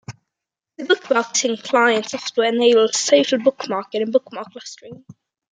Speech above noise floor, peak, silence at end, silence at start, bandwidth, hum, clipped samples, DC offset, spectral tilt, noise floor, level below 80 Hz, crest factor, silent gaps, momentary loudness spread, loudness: 66 dB; -2 dBFS; 0.4 s; 0.1 s; 9.6 kHz; none; under 0.1%; under 0.1%; -2 dB/octave; -85 dBFS; -72 dBFS; 18 dB; none; 19 LU; -18 LUFS